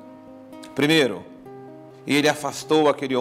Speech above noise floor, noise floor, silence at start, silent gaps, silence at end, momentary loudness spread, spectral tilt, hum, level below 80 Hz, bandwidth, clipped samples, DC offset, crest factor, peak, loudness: 23 dB; -43 dBFS; 0.05 s; none; 0 s; 23 LU; -4 dB/octave; none; -68 dBFS; 16 kHz; under 0.1%; under 0.1%; 18 dB; -6 dBFS; -21 LUFS